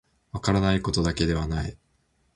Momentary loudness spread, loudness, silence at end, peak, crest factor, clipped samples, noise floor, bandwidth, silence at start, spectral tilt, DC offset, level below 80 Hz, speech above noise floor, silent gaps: 10 LU; -26 LUFS; 0.6 s; -6 dBFS; 20 dB; under 0.1%; -68 dBFS; 11.5 kHz; 0.35 s; -5.5 dB/octave; under 0.1%; -38 dBFS; 44 dB; none